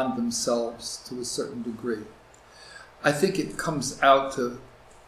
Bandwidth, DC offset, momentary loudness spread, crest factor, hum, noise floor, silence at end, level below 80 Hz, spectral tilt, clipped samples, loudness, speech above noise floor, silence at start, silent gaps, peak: 15.5 kHz; under 0.1%; 22 LU; 22 dB; none; -51 dBFS; 0.4 s; -58 dBFS; -3.5 dB/octave; under 0.1%; -26 LUFS; 24 dB; 0 s; none; -6 dBFS